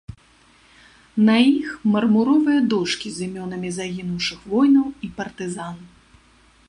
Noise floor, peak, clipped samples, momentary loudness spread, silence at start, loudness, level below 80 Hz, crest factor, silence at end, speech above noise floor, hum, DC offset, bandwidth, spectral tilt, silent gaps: -54 dBFS; -4 dBFS; under 0.1%; 14 LU; 1.15 s; -20 LUFS; -54 dBFS; 18 dB; 0.8 s; 35 dB; none; under 0.1%; 11 kHz; -5.5 dB/octave; none